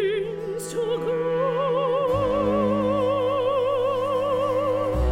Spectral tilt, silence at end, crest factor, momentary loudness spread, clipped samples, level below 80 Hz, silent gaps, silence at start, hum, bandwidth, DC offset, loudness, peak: -6.5 dB/octave; 0 s; 12 dB; 5 LU; under 0.1%; -38 dBFS; none; 0 s; none; 16 kHz; under 0.1%; -23 LUFS; -12 dBFS